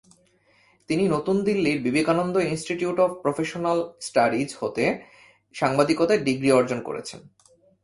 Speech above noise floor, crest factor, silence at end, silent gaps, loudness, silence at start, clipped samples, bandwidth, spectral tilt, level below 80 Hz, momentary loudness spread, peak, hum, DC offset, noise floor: 38 dB; 20 dB; 0.65 s; none; -24 LUFS; 0.9 s; under 0.1%; 11.5 kHz; -5.5 dB/octave; -60 dBFS; 8 LU; -4 dBFS; none; under 0.1%; -61 dBFS